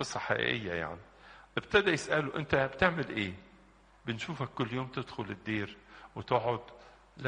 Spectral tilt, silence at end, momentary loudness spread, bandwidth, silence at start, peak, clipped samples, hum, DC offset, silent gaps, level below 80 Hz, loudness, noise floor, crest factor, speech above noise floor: -5 dB/octave; 0 s; 17 LU; 10 kHz; 0 s; -10 dBFS; under 0.1%; none; under 0.1%; none; -58 dBFS; -33 LUFS; -61 dBFS; 24 dB; 28 dB